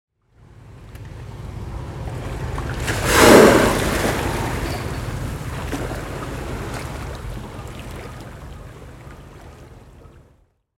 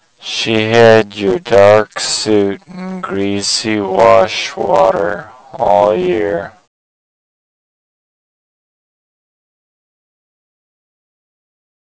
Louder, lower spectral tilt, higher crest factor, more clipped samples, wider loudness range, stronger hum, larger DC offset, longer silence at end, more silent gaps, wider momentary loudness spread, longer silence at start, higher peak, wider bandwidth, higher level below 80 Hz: second, -19 LUFS vs -12 LUFS; about the same, -4.5 dB/octave vs -4 dB/octave; first, 22 dB vs 14 dB; second, under 0.1% vs 1%; first, 19 LU vs 7 LU; neither; neither; second, 0.9 s vs 5.35 s; neither; first, 26 LU vs 13 LU; first, 0.6 s vs 0.2 s; about the same, 0 dBFS vs 0 dBFS; first, 17 kHz vs 8 kHz; first, -34 dBFS vs -48 dBFS